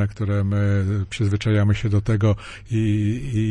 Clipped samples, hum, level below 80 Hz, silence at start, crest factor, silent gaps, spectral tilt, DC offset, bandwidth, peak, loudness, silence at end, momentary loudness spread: under 0.1%; none; -40 dBFS; 0 s; 12 dB; none; -7.5 dB/octave; under 0.1%; 9.6 kHz; -8 dBFS; -22 LUFS; 0 s; 4 LU